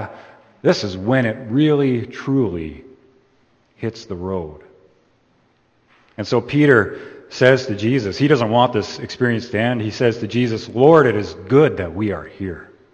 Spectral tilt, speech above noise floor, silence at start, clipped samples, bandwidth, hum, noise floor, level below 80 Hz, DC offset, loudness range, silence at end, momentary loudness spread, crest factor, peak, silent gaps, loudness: -7 dB/octave; 42 dB; 0 s; under 0.1%; 8.4 kHz; none; -59 dBFS; -52 dBFS; under 0.1%; 11 LU; 0.3 s; 16 LU; 18 dB; 0 dBFS; none; -18 LUFS